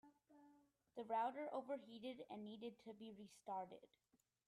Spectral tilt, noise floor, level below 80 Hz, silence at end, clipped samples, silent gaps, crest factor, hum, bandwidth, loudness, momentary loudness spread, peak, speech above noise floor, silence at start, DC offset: -5.5 dB/octave; -75 dBFS; under -90 dBFS; 0.6 s; under 0.1%; none; 18 dB; none; 13.5 kHz; -51 LUFS; 14 LU; -34 dBFS; 25 dB; 0.05 s; under 0.1%